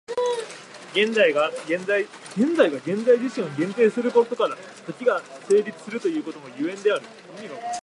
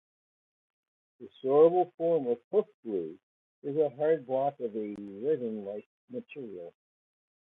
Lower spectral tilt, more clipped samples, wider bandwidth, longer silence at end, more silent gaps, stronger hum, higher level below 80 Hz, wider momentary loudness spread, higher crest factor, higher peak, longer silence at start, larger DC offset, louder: second, -4.5 dB/octave vs -10 dB/octave; neither; first, 11.5 kHz vs 3.9 kHz; second, 0.05 s vs 0.75 s; second, none vs 1.94-1.98 s, 2.44-2.51 s, 2.74-2.83 s, 3.23-3.62 s, 5.86-6.08 s; neither; about the same, -78 dBFS vs -80 dBFS; second, 16 LU vs 20 LU; about the same, 18 dB vs 20 dB; first, -6 dBFS vs -12 dBFS; second, 0.1 s vs 1.2 s; neither; first, -23 LUFS vs -30 LUFS